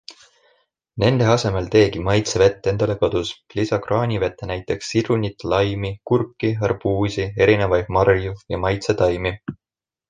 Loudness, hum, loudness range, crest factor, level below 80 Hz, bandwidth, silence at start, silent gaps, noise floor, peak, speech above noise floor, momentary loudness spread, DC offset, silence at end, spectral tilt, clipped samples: -20 LUFS; none; 3 LU; 18 dB; -40 dBFS; 9.6 kHz; 0.1 s; none; -63 dBFS; -2 dBFS; 44 dB; 9 LU; under 0.1%; 0.55 s; -6 dB/octave; under 0.1%